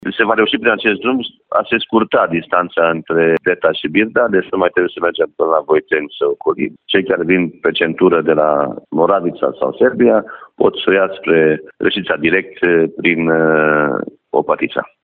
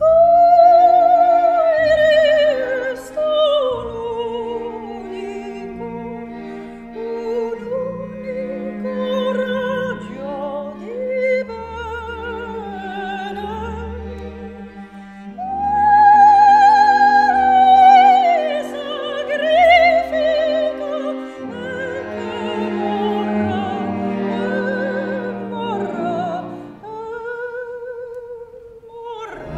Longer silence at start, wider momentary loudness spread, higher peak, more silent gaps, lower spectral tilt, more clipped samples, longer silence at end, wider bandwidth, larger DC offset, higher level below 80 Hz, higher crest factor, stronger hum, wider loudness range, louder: about the same, 0.05 s vs 0 s; second, 6 LU vs 21 LU; about the same, 0 dBFS vs 0 dBFS; neither; first, -9.5 dB/octave vs -5.5 dB/octave; neither; first, 0.15 s vs 0 s; second, 4.3 kHz vs 9 kHz; neither; second, -54 dBFS vs -46 dBFS; about the same, 14 dB vs 16 dB; neither; second, 2 LU vs 16 LU; about the same, -15 LUFS vs -16 LUFS